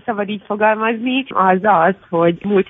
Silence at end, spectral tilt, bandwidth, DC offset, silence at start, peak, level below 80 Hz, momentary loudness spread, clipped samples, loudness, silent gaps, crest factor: 0.05 s; -10 dB/octave; 3.9 kHz; under 0.1%; 0.05 s; -2 dBFS; -58 dBFS; 8 LU; under 0.1%; -16 LUFS; none; 14 dB